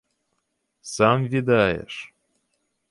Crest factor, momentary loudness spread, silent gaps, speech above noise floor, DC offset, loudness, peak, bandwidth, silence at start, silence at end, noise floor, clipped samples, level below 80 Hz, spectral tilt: 20 dB; 17 LU; none; 54 dB; under 0.1%; -21 LUFS; -6 dBFS; 11.5 kHz; 0.85 s; 0.85 s; -75 dBFS; under 0.1%; -54 dBFS; -5.5 dB/octave